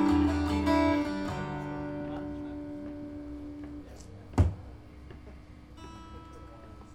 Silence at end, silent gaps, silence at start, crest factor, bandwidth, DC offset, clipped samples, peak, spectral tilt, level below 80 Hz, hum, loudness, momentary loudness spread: 0 s; none; 0 s; 20 dB; 11 kHz; under 0.1%; under 0.1%; -12 dBFS; -7.5 dB/octave; -42 dBFS; none; -32 LUFS; 23 LU